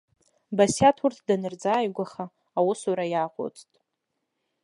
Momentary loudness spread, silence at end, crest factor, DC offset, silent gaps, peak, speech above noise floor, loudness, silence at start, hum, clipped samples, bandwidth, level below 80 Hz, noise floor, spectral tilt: 14 LU; 1.05 s; 20 dB; under 0.1%; none; -6 dBFS; 56 dB; -25 LUFS; 0.5 s; none; under 0.1%; 11.5 kHz; -64 dBFS; -81 dBFS; -5 dB/octave